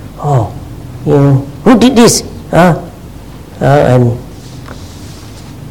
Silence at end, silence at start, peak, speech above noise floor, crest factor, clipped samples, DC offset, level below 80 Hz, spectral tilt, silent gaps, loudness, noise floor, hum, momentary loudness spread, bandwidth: 0 s; 0 s; 0 dBFS; 21 dB; 10 dB; 1%; 0.8%; -32 dBFS; -6 dB/octave; none; -9 LUFS; -29 dBFS; none; 22 LU; 17 kHz